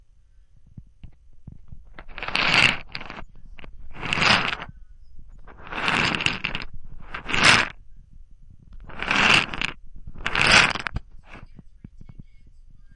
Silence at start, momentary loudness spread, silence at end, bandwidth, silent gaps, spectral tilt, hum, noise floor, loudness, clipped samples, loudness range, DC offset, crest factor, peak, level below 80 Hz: 0.55 s; 23 LU; 0.2 s; 11.5 kHz; none; -2.5 dB/octave; none; -52 dBFS; -20 LUFS; under 0.1%; 4 LU; under 0.1%; 22 dB; -4 dBFS; -42 dBFS